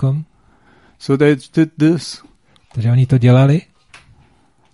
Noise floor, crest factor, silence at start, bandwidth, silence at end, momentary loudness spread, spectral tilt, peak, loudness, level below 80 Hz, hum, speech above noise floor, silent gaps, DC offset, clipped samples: -55 dBFS; 16 dB; 0 s; 11.5 kHz; 1.15 s; 18 LU; -8 dB/octave; 0 dBFS; -14 LUFS; -50 dBFS; none; 42 dB; none; 0.1%; under 0.1%